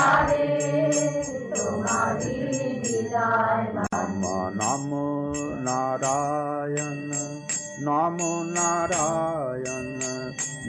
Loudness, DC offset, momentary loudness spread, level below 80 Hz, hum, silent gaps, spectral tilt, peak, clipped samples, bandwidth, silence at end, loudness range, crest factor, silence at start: -26 LUFS; under 0.1%; 7 LU; -54 dBFS; none; none; -4.5 dB/octave; -8 dBFS; under 0.1%; 11 kHz; 0 s; 2 LU; 18 dB; 0 s